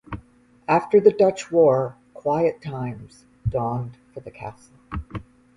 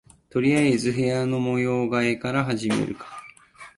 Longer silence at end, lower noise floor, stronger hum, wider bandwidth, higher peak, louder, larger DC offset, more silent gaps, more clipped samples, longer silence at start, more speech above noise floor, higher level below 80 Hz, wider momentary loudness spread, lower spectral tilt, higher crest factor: first, 0.35 s vs 0.1 s; first, -51 dBFS vs -47 dBFS; neither; about the same, 11 kHz vs 11.5 kHz; first, -2 dBFS vs -8 dBFS; about the same, -21 LUFS vs -23 LUFS; neither; neither; neither; second, 0.1 s vs 0.35 s; first, 29 dB vs 25 dB; first, -46 dBFS vs -58 dBFS; first, 21 LU vs 11 LU; first, -7.5 dB/octave vs -6 dB/octave; about the same, 20 dB vs 16 dB